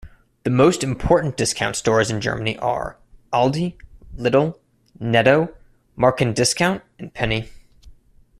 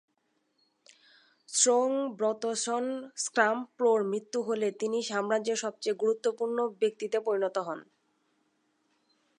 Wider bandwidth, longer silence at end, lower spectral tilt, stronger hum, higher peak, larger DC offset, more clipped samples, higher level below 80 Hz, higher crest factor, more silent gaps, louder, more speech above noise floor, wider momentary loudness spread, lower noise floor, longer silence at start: first, 13.5 kHz vs 11 kHz; second, 0.5 s vs 1.55 s; first, -4.5 dB/octave vs -2.5 dB/octave; neither; first, 0 dBFS vs -10 dBFS; neither; neither; first, -42 dBFS vs -90 dBFS; about the same, 20 dB vs 22 dB; neither; first, -20 LUFS vs -29 LUFS; second, 30 dB vs 47 dB; first, 12 LU vs 7 LU; second, -49 dBFS vs -76 dBFS; second, 0.05 s vs 1.5 s